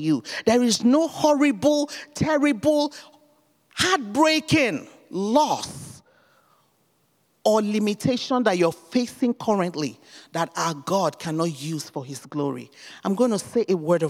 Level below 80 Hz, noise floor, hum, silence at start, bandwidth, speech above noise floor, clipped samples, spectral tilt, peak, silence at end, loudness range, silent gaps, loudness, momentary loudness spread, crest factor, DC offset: -62 dBFS; -66 dBFS; none; 0 s; 16 kHz; 44 dB; under 0.1%; -4.5 dB/octave; -4 dBFS; 0 s; 5 LU; none; -23 LUFS; 13 LU; 18 dB; under 0.1%